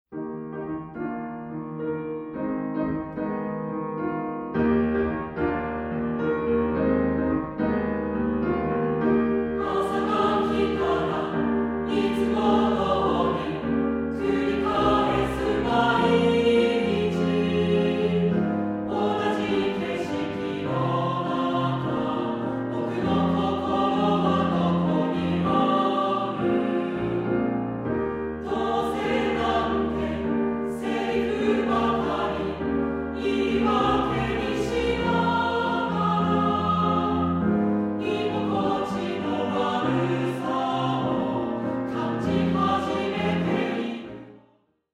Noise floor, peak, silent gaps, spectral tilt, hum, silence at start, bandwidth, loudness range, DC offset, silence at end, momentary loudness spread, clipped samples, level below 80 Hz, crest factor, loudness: -63 dBFS; -8 dBFS; none; -7.5 dB/octave; none; 0.1 s; 11.5 kHz; 4 LU; under 0.1%; 0.55 s; 7 LU; under 0.1%; -46 dBFS; 16 dB; -25 LUFS